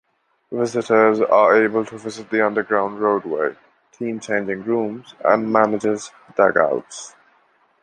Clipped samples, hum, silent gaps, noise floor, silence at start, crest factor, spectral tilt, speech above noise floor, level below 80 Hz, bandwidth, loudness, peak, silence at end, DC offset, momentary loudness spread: under 0.1%; none; none; -59 dBFS; 0.5 s; 18 dB; -5.5 dB/octave; 41 dB; -66 dBFS; 9.8 kHz; -19 LUFS; 0 dBFS; 0.75 s; under 0.1%; 14 LU